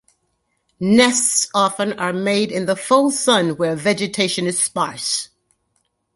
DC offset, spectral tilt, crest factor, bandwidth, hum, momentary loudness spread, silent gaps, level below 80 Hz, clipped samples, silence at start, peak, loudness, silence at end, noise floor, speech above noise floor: under 0.1%; -3 dB/octave; 18 dB; 12 kHz; none; 8 LU; none; -60 dBFS; under 0.1%; 0.8 s; -2 dBFS; -18 LUFS; 0.9 s; -69 dBFS; 51 dB